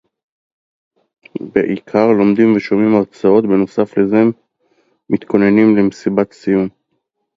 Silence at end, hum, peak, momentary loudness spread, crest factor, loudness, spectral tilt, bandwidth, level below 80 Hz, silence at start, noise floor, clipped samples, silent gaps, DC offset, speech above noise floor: 0.65 s; none; 0 dBFS; 8 LU; 14 dB; -14 LUFS; -8.5 dB/octave; 7.6 kHz; -54 dBFS; 1.4 s; -70 dBFS; under 0.1%; none; under 0.1%; 57 dB